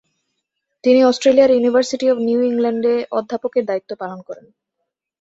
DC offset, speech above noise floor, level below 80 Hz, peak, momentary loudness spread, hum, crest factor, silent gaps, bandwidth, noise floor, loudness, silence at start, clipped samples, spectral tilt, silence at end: under 0.1%; 61 dB; -62 dBFS; -2 dBFS; 16 LU; none; 16 dB; none; 8 kHz; -78 dBFS; -16 LUFS; 0.85 s; under 0.1%; -4.5 dB/octave; 0.8 s